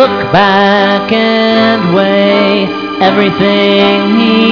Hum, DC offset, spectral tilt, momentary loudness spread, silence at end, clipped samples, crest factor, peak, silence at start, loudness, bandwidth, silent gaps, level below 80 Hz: none; under 0.1%; -7 dB/octave; 3 LU; 0 s; 0.5%; 8 dB; 0 dBFS; 0 s; -8 LUFS; 5.4 kHz; none; -46 dBFS